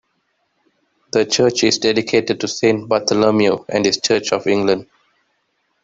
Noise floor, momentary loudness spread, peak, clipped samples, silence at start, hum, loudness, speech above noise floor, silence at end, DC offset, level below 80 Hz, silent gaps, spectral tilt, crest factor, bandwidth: -67 dBFS; 5 LU; -2 dBFS; under 0.1%; 1.15 s; none; -17 LUFS; 51 dB; 1 s; under 0.1%; -56 dBFS; none; -3.5 dB/octave; 16 dB; 8 kHz